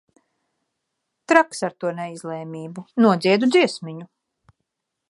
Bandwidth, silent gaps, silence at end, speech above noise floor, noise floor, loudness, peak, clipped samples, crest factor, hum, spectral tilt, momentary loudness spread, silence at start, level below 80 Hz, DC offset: 11.5 kHz; none; 1.05 s; 59 dB; -79 dBFS; -20 LUFS; 0 dBFS; under 0.1%; 22 dB; none; -5 dB/octave; 17 LU; 1.3 s; -72 dBFS; under 0.1%